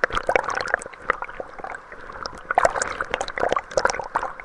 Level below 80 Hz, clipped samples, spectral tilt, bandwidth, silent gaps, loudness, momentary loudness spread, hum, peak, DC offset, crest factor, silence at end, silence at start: -46 dBFS; under 0.1%; -2 dB/octave; 11.5 kHz; none; -25 LUFS; 14 LU; none; 0 dBFS; under 0.1%; 24 dB; 0 s; 0 s